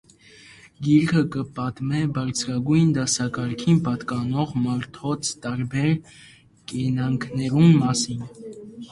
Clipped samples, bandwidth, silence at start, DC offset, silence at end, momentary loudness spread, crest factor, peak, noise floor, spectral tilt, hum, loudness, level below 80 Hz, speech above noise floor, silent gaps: under 0.1%; 11.5 kHz; 0.8 s; under 0.1%; 0.05 s; 11 LU; 16 dB; -6 dBFS; -49 dBFS; -5.5 dB/octave; none; -23 LUFS; -54 dBFS; 27 dB; none